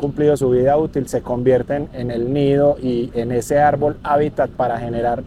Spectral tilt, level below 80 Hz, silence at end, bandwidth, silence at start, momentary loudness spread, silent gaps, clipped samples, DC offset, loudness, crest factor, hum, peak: -7.5 dB/octave; -40 dBFS; 0 s; 14.5 kHz; 0 s; 7 LU; none; under 0.1%; under 0.1%; -18 LUFS; 14 dB; none; -4 dBFS